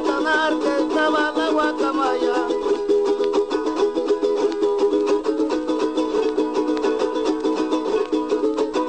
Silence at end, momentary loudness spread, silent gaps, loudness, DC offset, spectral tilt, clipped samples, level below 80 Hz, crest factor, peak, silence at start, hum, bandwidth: 0 s; 3 LU; none; -21 LUFS; 0.3%; -3.5 dB/octave; under 0.1%; -54 dBFS; 14 dB; -6 dBFS; 0 s; none; 9.2 kHz